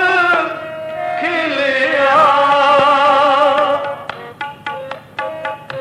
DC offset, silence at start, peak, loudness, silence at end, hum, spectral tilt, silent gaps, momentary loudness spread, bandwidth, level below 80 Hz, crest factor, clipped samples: under 0.1%; 0 s; -2 dBFS; -13 LUFS; 0 s; 50 Hz at -50 dBFS; -4 dB/octave; none; 16 LU; 11.5 kHz; -62 dBFS; 14 dB; under 0.1%